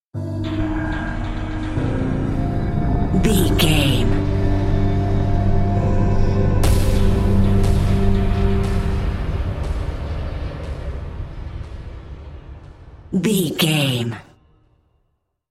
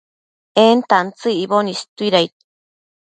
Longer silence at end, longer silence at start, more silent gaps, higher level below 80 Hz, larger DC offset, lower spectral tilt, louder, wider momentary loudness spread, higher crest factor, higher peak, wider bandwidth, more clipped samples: first, 1.3 s vs 0.8 s; second, 0.15 s vs 0.55 s; second, none vs 1.89-1.96 s; first, -22 dBFS vs -68 dBFS; neither; first, -6 dB/octave vs -4.5 dB/octave; second, -20 LUFS vs -16 LUFS; first, 15 LU vs 9 LU; about the same, 16 dB vs 18 dB; about the same, -2 dBFS vs 0 dBFS; first, 15.5 kHz vs 9.2 kHz; neither